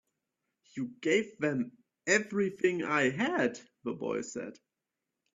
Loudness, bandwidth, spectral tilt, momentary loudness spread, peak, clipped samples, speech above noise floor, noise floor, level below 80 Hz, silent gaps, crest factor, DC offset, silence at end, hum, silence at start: -32 LUFS; 7.8 kHz; -4.5 dB/octave; 13 LU; -12 dBFS; under 0.1%; 57 dB; -88 dBFS; -76 dBFS; none; 22 dB; under 0.1%; 0.8 s; none; 0.75 s